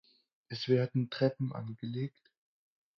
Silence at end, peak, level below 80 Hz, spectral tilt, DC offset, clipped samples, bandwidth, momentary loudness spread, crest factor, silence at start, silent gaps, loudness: 0.9 s; -16 dBFS; -76 dBFS; -8 dB/octave; under 0.1%; under 0.1%; 6.6 kHz; 11 LU; 20 dB; 0.5 s; none; -34 LUFS